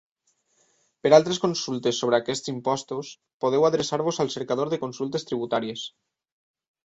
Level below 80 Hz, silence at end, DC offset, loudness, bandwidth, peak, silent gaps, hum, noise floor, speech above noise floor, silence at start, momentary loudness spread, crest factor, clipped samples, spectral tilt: -66 dBFS; 0.95 s; under 0.1%; -25 LUFS; 8 kHz; -2 dBFS; 3.33-3.40 s; none; -71 dBFS; 47 dB; 1.05 s; 14 LU; 22 dB; under 0.1%; -4.5 dB/octave